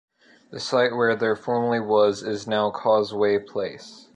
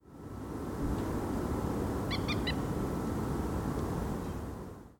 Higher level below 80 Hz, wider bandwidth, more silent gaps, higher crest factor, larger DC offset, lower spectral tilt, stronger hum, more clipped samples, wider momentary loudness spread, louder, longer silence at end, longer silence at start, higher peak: second, -66 dBFS vs -44 dBFS; second, 9.6 kHz vs 18 kHz; neither; about the same, 16 dB vs 14 dB; neither; second, -5 dB/octave vs -6.5 dB/octave; neither; neither; first, 11 LU vs 8 LU; first, -23 LUFS vs -35 LUFS; about the same, 0.15 s vs 0.05 s; first, 0.5 s vs 0.05 s; first, -8 dBFS vs -20 dBFS